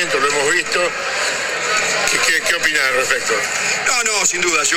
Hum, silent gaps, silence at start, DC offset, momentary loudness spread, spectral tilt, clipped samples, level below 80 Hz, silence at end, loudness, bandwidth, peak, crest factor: none; none; 0 s; under 0.1%; 4 LU; 0 dB/octave; under 0.1%; -50 dBFS; 0 s; -15 LUFS; 18 kHz; 0 dBFS; 16 dB